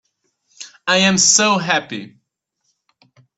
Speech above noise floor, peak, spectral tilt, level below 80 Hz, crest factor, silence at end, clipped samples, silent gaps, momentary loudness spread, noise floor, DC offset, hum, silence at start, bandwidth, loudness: 56 dB; 0 dBFS; -2 dB/octave; -60 dBFS; 20 dB; 1.3 s; under 0.1%; none; 22 LU; -72 dBFS; under 0.1%; none; 0.6 s; 8.4 kHz; -14 LUFS